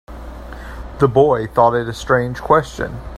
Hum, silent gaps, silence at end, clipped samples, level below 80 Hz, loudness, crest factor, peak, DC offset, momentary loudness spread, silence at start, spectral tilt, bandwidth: none; none; 0 s; under 0.1%; -34 dBFS; -16 LUFS; 18 dB; 0 dBFS; under 0.1%; 20 LU; 0.1 s; -6.5 dB/octave; 15 kHz